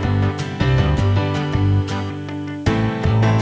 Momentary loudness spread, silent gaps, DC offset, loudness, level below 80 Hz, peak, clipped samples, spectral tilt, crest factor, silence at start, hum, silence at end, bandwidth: 8 LU; none; under 0.1%; -19 LUFS; -28 dBFS; -4 dBFS; under 0.1%; -7.5 dB/octave; 14 dB; 0 s; none; 0 s; 8 kHz